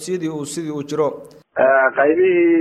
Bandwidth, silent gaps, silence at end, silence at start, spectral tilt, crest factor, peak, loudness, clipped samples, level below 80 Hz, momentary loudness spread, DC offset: 13 kHz; none; 0 s; 0 s; -5.5 dB/octave; 16 dB; -2 dBFS; -17 LUFS; under 0.1%; -64 dBFS; 12 LU; under 0.1%